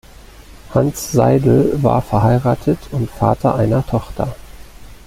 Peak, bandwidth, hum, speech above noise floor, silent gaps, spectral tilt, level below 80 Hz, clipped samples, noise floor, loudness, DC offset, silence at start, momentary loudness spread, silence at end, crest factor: -2 dBFS; 16 kHz; none; 24 dB; none; -7.5 dB/octave; -36 dBFS; under 0.1%; -39 dBFS; -16 LUFS; under 0.1%; 0.4 s; 9 LU; 0.1 s; 16 dB